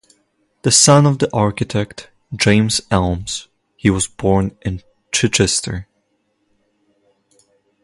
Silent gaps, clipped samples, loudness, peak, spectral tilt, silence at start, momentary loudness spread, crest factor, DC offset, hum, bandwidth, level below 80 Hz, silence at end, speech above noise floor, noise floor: none; under 0.1%; -16 LUFS; 0 dBFS; -4 dB/octave; 0.65 s; 17 LU; 18 dB; under 0.1%; none; 11.5 kHz; -38 dBFS; 2 s; 50 dB; -66 dBFS